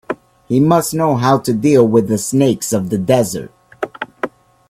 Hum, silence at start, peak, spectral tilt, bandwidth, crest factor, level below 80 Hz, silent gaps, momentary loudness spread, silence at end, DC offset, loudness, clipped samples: none; 0.1 s; 0 dBFS; -6 dB/octave; 16 kHz; 16 dB; -52 dBFS; none; 15 LU; 0.4 s; under 0.1%; -15 LUFS; under 0.1%